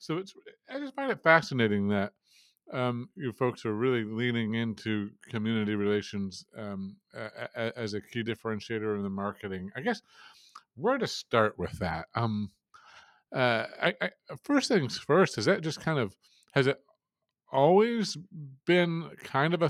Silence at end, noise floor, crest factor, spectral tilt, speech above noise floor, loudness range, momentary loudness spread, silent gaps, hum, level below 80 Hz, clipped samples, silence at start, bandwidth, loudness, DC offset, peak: 0 s; -87 dBFS; 24 dB; -5.5 dB/octave; 58 dB; 6 LU; 14 LU; none; none; -68 dBFS; under 0.1%; 0 s; 13.5 kHz; -30 LUFS; under 0.1%; -6 dBFS